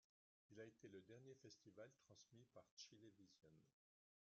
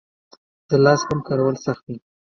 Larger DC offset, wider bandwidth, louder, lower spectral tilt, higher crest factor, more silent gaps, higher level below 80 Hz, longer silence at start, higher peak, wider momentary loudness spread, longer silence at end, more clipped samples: neither; about the same, 7.2 kHz vs 7 kHz; second, -65 LUFS vs -20 LUFS; second, -4.5 dB/octave vs -6 dB/octave; about the same, 20 dB vs 20 dB; first, 2.71-2.77 s vs none; second, under -90 dBFS vs -56 dBFS; second, 0.5 s vs 0.7 s; second, -48 dBFS vs 0 dBFS; second, 6 LU vs 17 LU; about the same, 0.5 s vs 0.4 s; neither